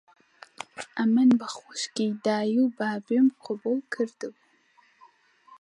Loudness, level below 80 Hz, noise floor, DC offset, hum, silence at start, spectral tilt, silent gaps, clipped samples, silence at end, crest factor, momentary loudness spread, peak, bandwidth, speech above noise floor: -26 LUFS; -80 dBFS; -63 dBFS; under 0.1%; none; 0.6 s; -5 dB/octave; none; under 0.1%; 1.3 s; 18 dB; 18 LU; -8 dBFS; 10.5 kHz; 37 dB